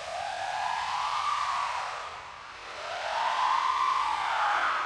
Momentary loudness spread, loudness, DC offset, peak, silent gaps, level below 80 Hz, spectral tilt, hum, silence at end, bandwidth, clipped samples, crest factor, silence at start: 13 LU; -29 LUFS; under 0.1%; -14 dBFS; none; -64 dBFS; -0.5 dB/octave; none; 0 s; 12 kHz; under 0.1%; 16 dB; 0 s